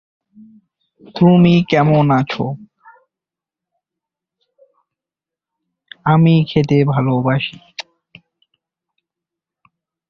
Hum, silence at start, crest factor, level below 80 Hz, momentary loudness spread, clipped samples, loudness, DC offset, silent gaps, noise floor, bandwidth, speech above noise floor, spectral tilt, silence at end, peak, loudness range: none; 1.15 s; 18 dB; -52 dBFS; 21 LU; under 0.1%; -14 LUFS; under 0.1%; none; -87 dBFS; 6.6 kHz; 74 dB; -8.5 dB/octave; 2.3 s; 0 dBFS; 8 LU